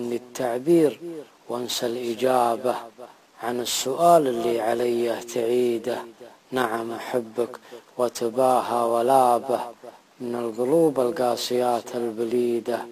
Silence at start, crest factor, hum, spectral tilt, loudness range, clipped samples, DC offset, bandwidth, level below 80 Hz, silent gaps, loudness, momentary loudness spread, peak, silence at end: 0 s; 20 dB; none; -4.5 dB/octave; 4 LU; under 0.1%; under 0.1%; 15 kHz; -72 dBFS; none; -24 LUFS; 14 LU; -4 dBFS; 0 s